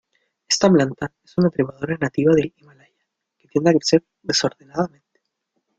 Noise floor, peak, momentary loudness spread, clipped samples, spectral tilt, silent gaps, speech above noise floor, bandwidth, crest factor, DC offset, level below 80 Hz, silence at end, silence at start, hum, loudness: -75 dBFS; -2 dBFS; 10 LU; under 0.1%; -5 dB/octave; none; 56 dB; 9.2 kHz; 20 dB; under 0.1%; -58 dBFS; 0.9 s; 0.5 s; none; -20 LUFS